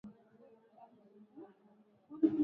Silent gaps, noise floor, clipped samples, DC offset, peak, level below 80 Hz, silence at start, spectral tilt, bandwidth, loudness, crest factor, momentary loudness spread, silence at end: none; -67 dBFS; under 0.1%; under 0.1%; -18 dBFS; -84 dBFS; 0.05 s; -9 dB/octave; 3.8 kHz; -35 LUFS; 22 dB; 29 LU; 0 s